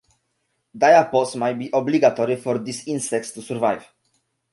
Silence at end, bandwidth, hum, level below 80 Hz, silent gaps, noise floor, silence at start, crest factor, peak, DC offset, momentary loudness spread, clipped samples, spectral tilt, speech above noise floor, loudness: 0.7 s; 11.5 kHz; none; -68 dBFS; none; -72 dBFS; 0.75 s; 18 dB; -2 dBFS; under 0.1%; 12 LU; under 0.1%; -5 dB/octave; 53 dB; -20 LUFS